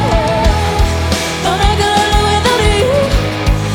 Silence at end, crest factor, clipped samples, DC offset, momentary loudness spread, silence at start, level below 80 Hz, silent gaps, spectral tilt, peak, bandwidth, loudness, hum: 0 s; 12 dB; under 0.1%; under 0.1%; 4 LU; 0 s; -18 dBFS; none; -4.5 dB/octave; 0 dBFS; 18 kHz; -13 LUFS; none